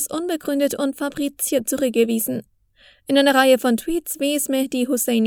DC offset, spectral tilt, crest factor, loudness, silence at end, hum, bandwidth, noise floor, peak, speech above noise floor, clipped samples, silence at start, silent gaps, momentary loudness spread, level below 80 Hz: under 0.1%; -3 dB/octave; 20 dB; -20 LUFS; 0 s; none; over 20 kHz; -54 dBFS; 0 dBFS; 35 dB; under 0.1%; 0 s; none; 10 LU; -54 dBFS